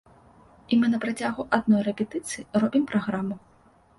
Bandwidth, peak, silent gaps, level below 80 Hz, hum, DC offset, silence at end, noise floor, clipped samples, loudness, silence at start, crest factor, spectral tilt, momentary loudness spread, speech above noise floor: 11.5 kHz; -4 dBFS; none; -62 dBFS; none; under 0.1%; 0.6 s; -54 dBFS; under 0.1%; -25 LUFS; 0.7 s; 22 dB; -5.5 dB/octave; 9 LU; 30 dB